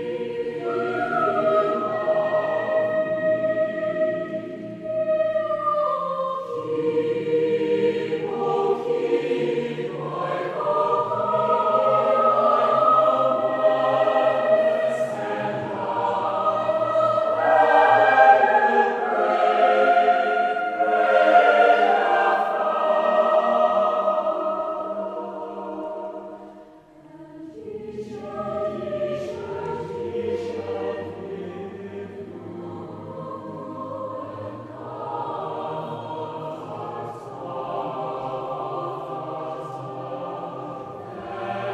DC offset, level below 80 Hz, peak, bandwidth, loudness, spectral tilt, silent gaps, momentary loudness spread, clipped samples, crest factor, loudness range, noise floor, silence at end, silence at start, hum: under 0.1%; -66 dBFS; -2 dBFS; 9 kHz; -22 LUFS; -6 dB/octave; none; 17 LU; under 0.1%; 20 dB; 14 LU; -48 dBFS; 0 s; 0 s; none